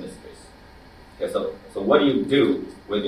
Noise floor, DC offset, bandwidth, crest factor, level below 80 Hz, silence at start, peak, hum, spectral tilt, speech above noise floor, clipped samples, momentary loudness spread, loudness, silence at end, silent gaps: -47 dBFS; under 0.1%; 12.5 kHz; 20 dB; -52 dBFS; 0 s; -4 dBFS; none; -6 dB/octave; 26 dB; under 0.1%; 14 LU; -22 LUFS; 0 s; none